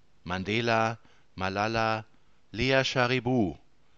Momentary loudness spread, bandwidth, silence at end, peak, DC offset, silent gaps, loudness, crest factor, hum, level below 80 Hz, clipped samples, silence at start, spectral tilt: 10 LU; 7.8 kHz; 0.4 s; -8 dBFS; 0.2%; none; -28 LUFS; 22 dB; none; -54 dBFS; under 0.1%; 0.25 s; -5.5 dB/octave